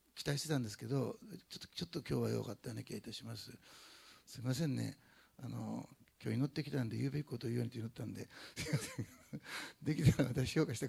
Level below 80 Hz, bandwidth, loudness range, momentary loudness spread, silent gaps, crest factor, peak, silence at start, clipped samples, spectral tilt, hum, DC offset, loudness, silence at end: -62 dBFS; 16 kHz; 5 LU; 16 LU; none; 22 dB; -18 dBFS; 0.15 s; under 0.1%; -6 dB/octave; none; under 0.1%; -41 LUFS; 0 s